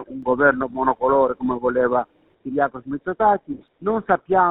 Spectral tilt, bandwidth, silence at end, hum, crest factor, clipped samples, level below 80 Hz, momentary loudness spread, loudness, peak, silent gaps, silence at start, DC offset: -5.5 dB/octave; 4 kHz; 0 s; none; 18 dB; under 0.1%; -52 dBFS; 11 LU; -21 LUFS; -2 dBFS; none; 0 s; under 0.1%